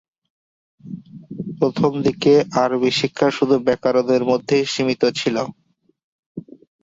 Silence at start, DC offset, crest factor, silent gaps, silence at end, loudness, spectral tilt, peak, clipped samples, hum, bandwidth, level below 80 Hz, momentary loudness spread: 0.85 s; under 0.1%; 16 dB; 6.04-6.35 s; 0.45 s; -18 LUFS; -5.5 dB/octave; -4 dBFS; under 0.1%; none; 7.8 kHz; -58 dBFS; 21 LU